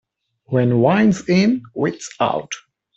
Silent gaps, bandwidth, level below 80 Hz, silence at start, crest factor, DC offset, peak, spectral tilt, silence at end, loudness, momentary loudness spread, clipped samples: none; 8.2 kHz; -56 dBFS; 0.5 s; 16 dB; under 0.1%; -4 dBFS; -6.5 dB/octave; 0.4 s; -18 LUFS; 10 LU; under 0.1%